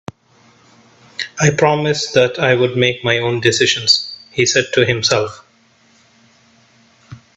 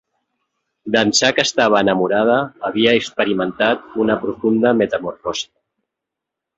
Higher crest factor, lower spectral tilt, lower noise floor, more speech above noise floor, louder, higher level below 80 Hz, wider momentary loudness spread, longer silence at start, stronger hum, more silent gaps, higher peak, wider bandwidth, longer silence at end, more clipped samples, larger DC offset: about the same, 18 dB vs 18 dB; about the same, -3.5 dB/octave vs -3.5 dB/octave; second, -53 dBFS vs -83 dBFS; second, 38 dB vs 66 dB; about the same, -15 LUFS vs -17 LUFS; about the same, -54 dBFS vs -56 dBFS; about the same, 12 LU vs 10 LU; first, 1.2 s vs 0.85 s; neither; neither; about the same, 0 dBFS vs 0 dBFS; about the same, 8.4 kHz vs 8 kHz; second, 0.2 s vs 1.15 s; neither; neither